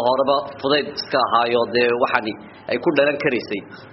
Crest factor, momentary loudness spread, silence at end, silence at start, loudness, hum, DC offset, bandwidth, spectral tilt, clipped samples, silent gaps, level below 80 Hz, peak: 18 dB; 10 LU; 0 s; 0 s; -20 LUFS; none; under 0.1%; 6 kHz; -2 dB/octave; under 0.1%; none; -60 dBFS; -2 dBFS